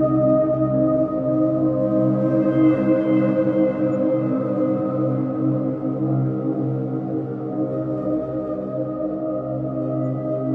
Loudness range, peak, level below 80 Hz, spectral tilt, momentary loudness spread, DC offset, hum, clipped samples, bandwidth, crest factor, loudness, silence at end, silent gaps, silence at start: 6 LU; -6 dBFS; -52 dBFS; -11.5 dB/octave; 8 LU; under 0.1%; none; under 0.1%; 3.4 kHz; 14 dB; -21 LUFS; 0 s; none; 0 s